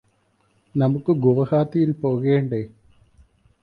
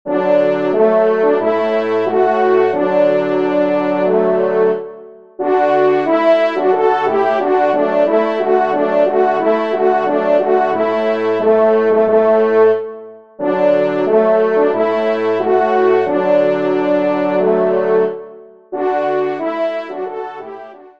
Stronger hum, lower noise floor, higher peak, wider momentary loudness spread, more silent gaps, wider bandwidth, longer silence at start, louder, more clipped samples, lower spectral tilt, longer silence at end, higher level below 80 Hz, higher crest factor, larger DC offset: neither; first, -64 dBFS vs -37 dBFS; about the same, -4 dBFS vs -2 dBFS; about the same, 10 LU vs 8 LU; neither; second, 5.2 kHz vs 6.4 kHz; first, 0.75 s vs 0.05 s; second, -21 LUFS vs -14 LUFS; neither; first, -11 dB/octave vs -7.5 dB/octave; first, 0.95 s vs 0.1 s; first, -58 dBFS vs -68 dBFS; first, 18 dB vs 12 dB; second, under 0.1% vs 0.5%